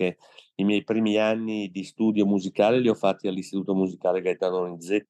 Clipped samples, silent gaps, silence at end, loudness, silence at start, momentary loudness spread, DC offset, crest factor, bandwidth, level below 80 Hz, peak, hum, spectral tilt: under 0.1%; none; 0.05 s; -25 LUFS; 0 s; 8 LU; under 0.1%; 18 dB; 11.5 kHz; -80 dBFS; -8 dBFS; none; -6.5 dB/octave